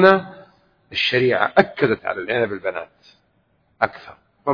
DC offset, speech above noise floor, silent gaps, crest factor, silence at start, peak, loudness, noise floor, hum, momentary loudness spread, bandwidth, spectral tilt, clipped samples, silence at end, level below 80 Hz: under 0.1%; 44 dB; none; 20 dB; 0 s; 0 dBFS; -20 LUFS; -64 dBFS; none; 16 LU; 5.4 kHz; -6.5 dB/octave; under 0.1%; 0 s; -60 dBFS